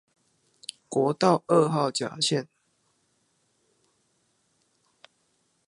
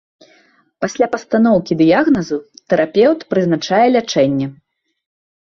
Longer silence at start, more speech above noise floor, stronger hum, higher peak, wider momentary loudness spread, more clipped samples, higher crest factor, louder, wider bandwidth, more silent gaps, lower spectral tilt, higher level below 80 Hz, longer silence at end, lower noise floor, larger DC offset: about the same, 0.9 s vs 0.8 s; first, 47 dB vs 39 dB; neither; second, -6 dBFS vs -2 dBFS; first, 19 LU vs 11 LU; neither; first, 24 dB vs 14 dB; second, -25 LUFS vs -15 LUFS; first, 11.5 kHz vs 7.4 kHz; neither; about the same, -5 dB/octave vs -6 dB/octave; second, -78 dBFS vs -54 dBFS; first, 3.25 s vs 0.95 s; first, -71 dBFS vs -54 dBFS; neither